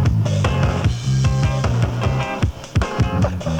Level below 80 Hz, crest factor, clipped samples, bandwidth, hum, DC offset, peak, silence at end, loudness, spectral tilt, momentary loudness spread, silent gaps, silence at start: -28 dBFS; 14 dB; under 0.1%; 10 kHz; none; under 0.1%; -4 dBFS; 0 s; -19 LUFS; -6.5 dB/octave; 4 LU; none; 0 s